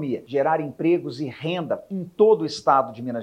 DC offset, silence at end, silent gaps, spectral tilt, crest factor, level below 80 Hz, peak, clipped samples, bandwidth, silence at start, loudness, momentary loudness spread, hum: under 0.1%; 0 s; none; -6.5 dB/octave; 18 dB; -68 dBFS; -4 dBFS; under 0.1%; 9.6 kHz; 0 s; -23 LUFS; 11 LU; none